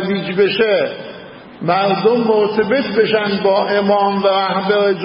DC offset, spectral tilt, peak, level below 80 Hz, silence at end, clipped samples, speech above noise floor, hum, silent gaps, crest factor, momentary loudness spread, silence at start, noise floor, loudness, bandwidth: under 0.1%; -11 dB/octave; -2 dBFS; -58 dBFS; 0 s; under 0.1%; 20 dB; none; none; 14 dB; 7 LU; 0 s; -35 dBFS; -15 LUFS; 5.6 kHz